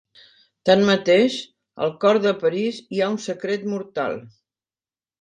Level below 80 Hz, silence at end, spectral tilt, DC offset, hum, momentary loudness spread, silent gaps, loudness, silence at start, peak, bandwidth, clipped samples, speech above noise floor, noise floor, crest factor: -66 dBFS; 0.9 s; -5.5 dB/octave; under 0.1%; none; 11 LU; none; -21 LUFS; 0.65 s; -4 dBFS; 9.6 kHz; under 0.1%; over 70 dB; under -90 dBFS; 18 dB